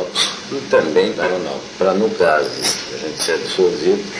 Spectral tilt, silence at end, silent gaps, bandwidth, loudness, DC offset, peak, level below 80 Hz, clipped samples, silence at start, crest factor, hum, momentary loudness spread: -3 dB/octave; 0 s; none; 11 kHz; -17 LUFS; under 0.1%; -2 dBFS; -54 dBFS; under 0.1%; 0 s; 16 dB; none; 7 LU